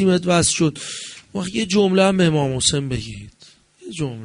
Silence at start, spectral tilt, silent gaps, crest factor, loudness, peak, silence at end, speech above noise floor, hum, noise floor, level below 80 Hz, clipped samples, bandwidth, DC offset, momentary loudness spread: 0 s; -4.5 dB/octave; none; 18 dB; -19 LUFS; -2 dBFS; 0 s; 31 dB; none; -50 dBFS; -46 dBFS; under 0.1%; 11 kHz; under 0.1%; 15 LU